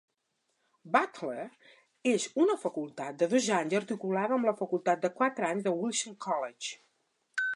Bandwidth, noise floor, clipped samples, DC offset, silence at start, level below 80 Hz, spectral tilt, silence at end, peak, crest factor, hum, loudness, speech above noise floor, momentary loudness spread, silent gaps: 11.5 kHz; -79 dBFS; under 0.1%; under 0.1%; 0.85 s; -86 dBFS; -4 dB/octave; 0 s; -10 dBFS; 22 dB; none; -31 LUFS; 49 dB; 11 LU; none